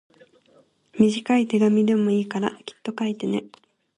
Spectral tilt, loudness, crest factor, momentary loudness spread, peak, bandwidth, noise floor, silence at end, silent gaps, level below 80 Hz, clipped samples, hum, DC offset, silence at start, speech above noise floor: -6.5 dB/octave; -22 LUFS; 18 dB; 12 LU; -4 dBFS; 10.5 kHz; -59 dBFS; 0.5 s; none; -66 dBFS; under 0.1%; none; under 0.1%; 0.95 s; 37 dB